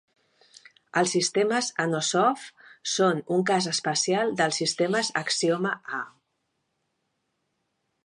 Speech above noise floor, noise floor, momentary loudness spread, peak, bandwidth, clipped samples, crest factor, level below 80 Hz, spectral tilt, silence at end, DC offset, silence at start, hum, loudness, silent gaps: 52 dB; -77 dBFS; 10 LU; -8 dBFS; 11.5 kHz; under 0.1%; 20 dB; -78 dBFS; -3 dB/octave; 1.95 s; under 0.1%; 0.95 s; none; -25 LUFS; none